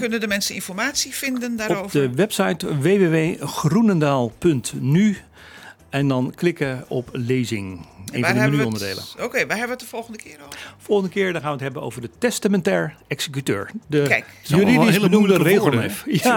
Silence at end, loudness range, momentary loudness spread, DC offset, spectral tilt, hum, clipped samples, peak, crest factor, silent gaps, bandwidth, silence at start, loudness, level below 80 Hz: 0 s; 6 LU; 13 LU; under 0.1%; -5.5 dB/octave; none; under 0.1%; -2 dBFS; 18 dB; none; 19 kHz; 0 s; -20 LUFS; -56 dBFS